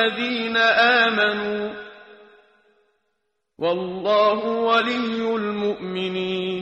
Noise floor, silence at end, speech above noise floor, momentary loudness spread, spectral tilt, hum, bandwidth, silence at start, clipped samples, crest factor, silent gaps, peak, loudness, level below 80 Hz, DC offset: -76 dBFS; 0 s; 55 dB; 11 LU; -5 dB/octave; none; 8.8 kHz; 0 s; under 0.1%; 18 dB; none; -6 dBFS; -21 LUFS; -64 dBFS; under 0.1%